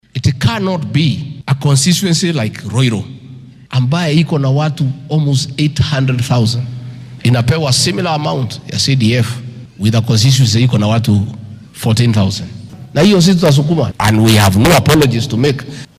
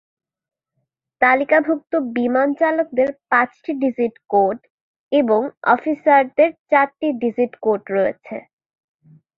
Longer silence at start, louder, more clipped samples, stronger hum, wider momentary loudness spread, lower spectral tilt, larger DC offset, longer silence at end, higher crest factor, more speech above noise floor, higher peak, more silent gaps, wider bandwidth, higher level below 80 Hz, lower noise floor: second, 0.15 s vs 1.2 s; first, -13 LUFS vs -18 LUFS; neither; neither; first, 12 LU vs 7 LU; second, -5.5 dB/octave vs -8 dB/octave; neither; second, 0.15 s vs 1 s; second, 10 dB vs 18 dB; second, 23 dB vs 57 dB; about the same, -2 dBFS vs -2 dBFS; second, none vs 4.70-5.09 s, 5.57-5.61 s, 6.59-6.65 s; first, 16 kHz vs 5.2 kHz; first, -40 dBFS vs -66 dBFS; second, -34 dBFS vs -75 dBFS